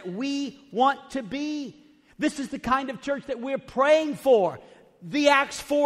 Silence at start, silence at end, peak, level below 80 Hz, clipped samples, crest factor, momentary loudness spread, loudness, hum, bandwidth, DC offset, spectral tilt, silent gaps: 0 s; 0 s; -6 dBFS; -60 dBFS; under 0.1%; 18 dB; 12 LU; -25 LUFS; none; 14.5 kHz; under 0.1%; -4 dB/octave; none